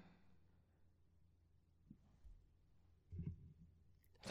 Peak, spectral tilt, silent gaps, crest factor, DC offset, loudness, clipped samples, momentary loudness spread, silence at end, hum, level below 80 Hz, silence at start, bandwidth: -34 dBFS; -6.5 dB/octave; none; 26 dB; under 0.1%; -56 LUFS; under 0.1%; 17 LU; 0 s; none; -70 dBFS; 0 s; 7 kHz